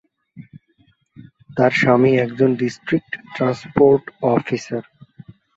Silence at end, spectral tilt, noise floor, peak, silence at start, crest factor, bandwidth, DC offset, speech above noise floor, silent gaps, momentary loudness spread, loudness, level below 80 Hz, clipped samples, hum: 0.75 s; -7 dB/octave; -60 dBFS; -2 dBFS; 0.35 s; 18 dB; 7.8 kHz; under 0.1%; 42 dB; none; 13 LU; -18 LUFS; -54 dBFS; under 0.1%; none